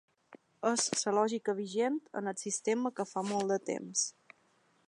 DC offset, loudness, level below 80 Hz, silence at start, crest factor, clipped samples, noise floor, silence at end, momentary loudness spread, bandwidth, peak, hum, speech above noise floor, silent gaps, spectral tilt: under 0.1%; -33 LUFS; -84 dBFS; 0.3 s; 20 dB; under 0.1%; -70 dBFS; 0.8 s; 7 LU; 11.5 kHz; -16 dBFS; none; 37 dB; none; -3 dB/octave